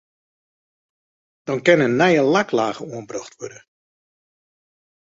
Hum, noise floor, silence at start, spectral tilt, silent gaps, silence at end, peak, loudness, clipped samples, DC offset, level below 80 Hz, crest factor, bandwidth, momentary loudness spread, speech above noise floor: none; under -90 dBFS; 1.45 s; -5.5 dB/octave; none; 1.6 s; -2 dBFS; -18 LUFS; under 0.1%; under 0.1%; -64 dBFS; 20 dB; 7.8 kHz; 20 LU; over 71 dB